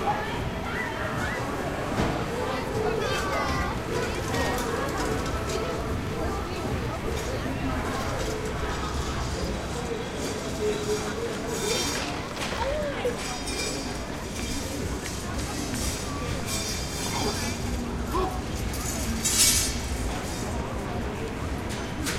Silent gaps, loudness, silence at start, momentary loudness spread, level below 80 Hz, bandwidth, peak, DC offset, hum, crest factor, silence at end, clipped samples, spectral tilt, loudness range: none; -29 LUFS; 0 s; 5 LU; -38 dBFS; 16 kHz; -6 dBFS; under 0.1%; none; 22 dB; 0 s; under 0.1%; -3.5 dB/octave; 5 LU